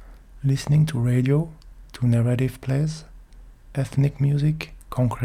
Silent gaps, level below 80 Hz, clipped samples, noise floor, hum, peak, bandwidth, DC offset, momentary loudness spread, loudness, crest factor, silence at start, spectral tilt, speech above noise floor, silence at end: none; -44 dBFS; under 0.1%; -45 dBFS; none; -10 dBFS; 14.5 kHz; under 0.1%; 11 LU; -23 LUFS; 14 dB; 0 s; -7.5 dB/octave; 24 dB; 0 s